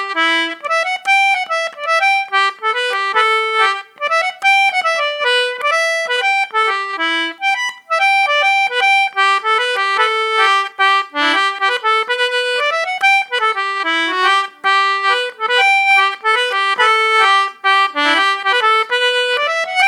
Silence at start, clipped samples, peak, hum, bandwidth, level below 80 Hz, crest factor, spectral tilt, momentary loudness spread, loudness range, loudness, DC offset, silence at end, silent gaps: 0 s; under 0.1%; 0 dBFS; none; 16 kHz; -80 dBFS; 14 dB; 1.5 dB/octave; 5 LU; 2 LU; -14 LUFS; under 0.1%; 0 s; none